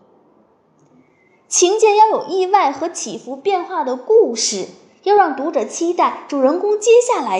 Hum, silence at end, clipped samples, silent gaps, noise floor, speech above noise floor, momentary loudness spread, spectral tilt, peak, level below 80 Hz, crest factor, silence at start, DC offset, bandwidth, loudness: none; 0 s; under 0.1%; none; -55 dBFS; 40 dB; 11 LU; -2 dB/octave; -2 dBFS; -76 dBFS; 16 dB; 1.5 s; under 0.1%; 11.5 kHz; -16 LUFS